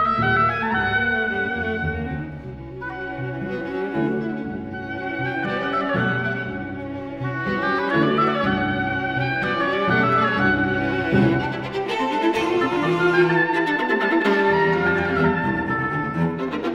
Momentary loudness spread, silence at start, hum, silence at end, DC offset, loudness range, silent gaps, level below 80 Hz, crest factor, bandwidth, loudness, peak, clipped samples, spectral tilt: 11 LU; 0 s; none; 0 s; under 0.1%; 7 LU; none; -46 dBFS; 16 dB; 11 kHz; -21 LUFS; -6 dBFS; under 0.1%; -7 dB/octave